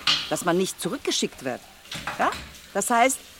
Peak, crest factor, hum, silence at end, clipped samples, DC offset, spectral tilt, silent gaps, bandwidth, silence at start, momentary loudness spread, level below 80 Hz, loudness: -6 dBFS; 20 dB; none; 0 s; under 0.1%; under 0.1%; -2.5 dB/octave; none; 17 kHz; 0 s; 13 LU; -54 dBFS; -25 LUFS